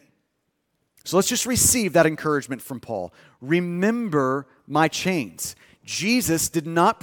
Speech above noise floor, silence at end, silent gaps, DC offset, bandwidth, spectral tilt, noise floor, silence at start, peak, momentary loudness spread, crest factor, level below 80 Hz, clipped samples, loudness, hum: 52 dB; 0.1 s; none; under 0.1%; 18 kHz; -3.5 dB/octave; -74 dBFS; 1.05 s; -2 dBFS; 14 LU; 20 dB; -54 dBFS; under 0.1%; -22 LUFS; none